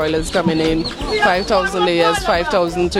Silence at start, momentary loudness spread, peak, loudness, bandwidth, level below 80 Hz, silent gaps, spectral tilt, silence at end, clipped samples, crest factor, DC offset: 0 s; 4 LU; -2 dBFS; -16 LUFS; 15.5 kHz; -34 dBFS; none; -4.5 dB/octave; 0 s; under 0.1%; 14 dB; under 0.1%